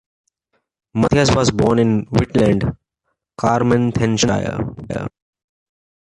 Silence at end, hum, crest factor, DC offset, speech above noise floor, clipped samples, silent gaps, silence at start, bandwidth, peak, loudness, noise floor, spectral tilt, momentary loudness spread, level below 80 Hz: 0.95 s; none; 16 dB; under 0.1%; 58 dB; under 0.1%; none; 0.95 s; 11 kHz; -2 dBFS; -17 LUFS; -74 dBFS; -6 dB/octave; 12 LU; -38 dBFS